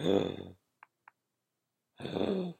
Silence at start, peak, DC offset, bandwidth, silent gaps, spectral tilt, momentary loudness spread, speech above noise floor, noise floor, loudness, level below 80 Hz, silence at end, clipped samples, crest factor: 0 s; -14 dBFS; under 0.1%; 15 kHz; none; -7 dB/octave; 15 LU; 53 dB; -86 dBFS; -35 LUFS; -72 dBFS; 0.05 s; under 0.1%; 22 dB